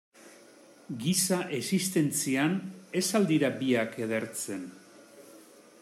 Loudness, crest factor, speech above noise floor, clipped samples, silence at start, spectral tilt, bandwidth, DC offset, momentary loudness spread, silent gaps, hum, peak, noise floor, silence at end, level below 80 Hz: -29 LUFS; 16 dB; 26 dB; under 0.1%; 0.2 s; -4 dB/octave; 15 kHz; under 0.1%; 9 LU; none; none; -14 dBFS; -55 dBFS; 0.4 s; -76 dBFS